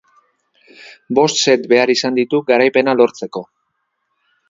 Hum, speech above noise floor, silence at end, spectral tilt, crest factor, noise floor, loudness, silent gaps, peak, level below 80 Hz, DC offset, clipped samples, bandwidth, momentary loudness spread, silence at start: none; 56 dB; 1.05 s; -3.5 dB/octave; 16 dB; -70 dBFS; -14 LUFS; none; 0 dBFS; -64 dBFS; under 0.1%; under 0.1%; 7.8 kHz; 11 LU; 0.85 s